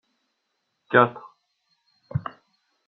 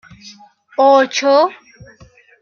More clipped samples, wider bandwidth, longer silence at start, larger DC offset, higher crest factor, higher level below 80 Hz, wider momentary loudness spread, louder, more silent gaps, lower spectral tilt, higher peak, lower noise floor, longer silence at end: neither; second, 4.7 kHz vs 7 kHz; first, 0.9 s vs 0.25 s; neither; first, 26 dB vs 14 dB; about the same, -62 dBFS vs -60 dBFS; first, 20 LU vs 8 LU; second, -23 LUFS vs -13 LUFS; neither; first, -4.5 dB/octave vs -3 dB/octave; about the same, -2 dBFS vs -2 dBFS; first, -76 dBFS vs -47 dBFS; second, 0.65 s vs 0.9 s